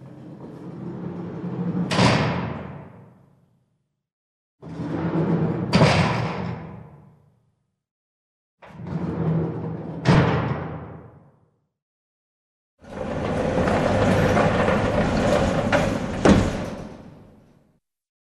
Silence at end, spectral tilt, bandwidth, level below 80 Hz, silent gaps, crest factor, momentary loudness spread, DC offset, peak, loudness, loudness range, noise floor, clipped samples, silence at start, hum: 1.05 s; -6.5 dB/octave; 12 kHz; -40 dBFS; 4.13-4.58 s, 7.91-8.58 s, 11.82-12.78 s; 22 dB; 21 LU; under 0.1%; -2 dBFS; -22 LUFS; 10 LU; -73 dBFS; under 0.1%; 0 s; none